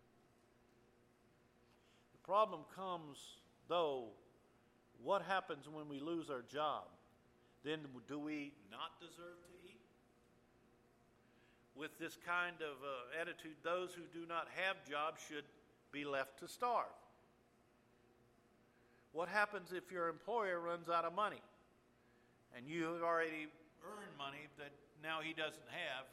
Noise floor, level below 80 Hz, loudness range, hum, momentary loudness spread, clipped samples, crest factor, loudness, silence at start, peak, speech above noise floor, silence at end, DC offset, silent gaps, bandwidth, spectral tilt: -73 dBFS; -84 dBFS; 8 LU; none; 18 LU; under 0.1%; 24 dB; -44 LUFS; 2.15 s; -22 dBFS; 29 dB; 0 s; under 0.1%; none; 15.5 kHz; -4 dB/octave